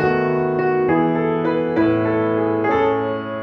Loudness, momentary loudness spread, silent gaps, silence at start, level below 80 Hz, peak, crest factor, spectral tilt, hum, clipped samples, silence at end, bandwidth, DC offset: -19 LUFS; 2 LU; none; 0 s; -50 dBFS; -6 dBFS; 12 dB; -9 dB/octave; none; under 0.1%; 0 s; 6 kHz; under 0.1%